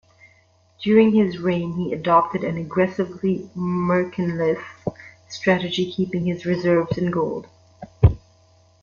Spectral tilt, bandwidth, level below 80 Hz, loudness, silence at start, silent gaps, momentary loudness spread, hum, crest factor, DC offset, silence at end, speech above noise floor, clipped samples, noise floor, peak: -7.5 dB/octave; 7.2 kHz; -38 dBFS; -21 LUFS; 0.8 s; none; 9 LU; none; 20 dB; under 0.1%; 0.65 s; 37 dB; under 0.1%; -58 dBFS; -2 dBFS